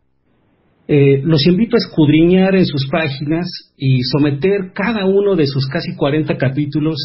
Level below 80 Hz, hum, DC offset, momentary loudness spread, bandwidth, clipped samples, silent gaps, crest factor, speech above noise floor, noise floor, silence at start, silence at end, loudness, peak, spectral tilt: -44 dBFS; none; under 0.1%; 8 LU; 5.8 kHz; under 0.1%; none; 14 dB; 46 dB; -60 dBFS; 0.9 s; 0 s; -15 LUFS; -2 dBFS; -11 dB/octave